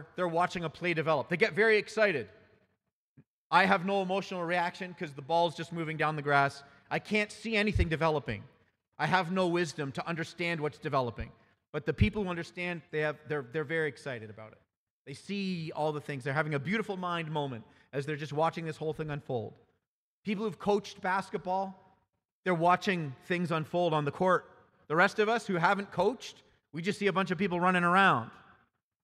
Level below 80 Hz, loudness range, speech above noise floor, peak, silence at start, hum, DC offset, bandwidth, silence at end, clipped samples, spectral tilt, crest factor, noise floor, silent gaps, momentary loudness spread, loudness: -52 dBFS; 6 LU; 54 dB; -10 dBFS; 0 s; none; under 0.1%; 13 kHz; 0.65 s; under 0.1%; -6 dB/octave; 22 dB; -85 dBFS; 2.92-3.16 s, 3.27-3.50 s, 8.88-8.92 s, 11.69-11.73 s, 14.77-15.05 s, 19.87-20.23 s, 22.25-22.43 s; 13 LU; -31 LUFS